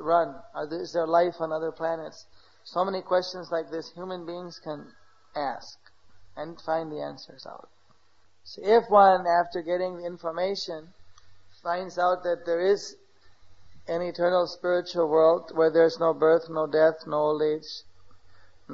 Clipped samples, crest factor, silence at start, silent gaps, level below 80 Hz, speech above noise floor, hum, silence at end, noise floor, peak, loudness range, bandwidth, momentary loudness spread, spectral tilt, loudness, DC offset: under 0.1%; 20 dB; 0 s; none; -68 dBFS; 40 dB; none; 0 s; -66 dBFS; -6 dBFS; 12 LU; 7.4 kHz; 18 LU; -5.5 dB/octave; -26 LUFS; 0.2%